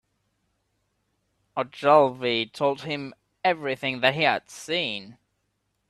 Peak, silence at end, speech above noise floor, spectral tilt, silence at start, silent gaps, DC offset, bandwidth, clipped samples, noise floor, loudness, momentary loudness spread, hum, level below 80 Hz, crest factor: -4 dBFS; 0.75 s; 51 dB; -4.5 dB/octave; 1.55 s; none; under 0.1%; 13 kHz; under 0.1%; -75 dBFS; -24 LUFS; 13 LU; none; -70 dBFS; 22 dB